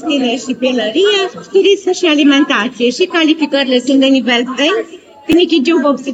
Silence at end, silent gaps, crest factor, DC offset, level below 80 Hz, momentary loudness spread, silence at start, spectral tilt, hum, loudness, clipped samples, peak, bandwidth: 0 s; none; 12 dB; under 0.1%; -56 dBFS; 5 LU; 0 s; -3 dB/octave; none; -12 LUFS; under 0.1%; 0 dBFS; 9 kHz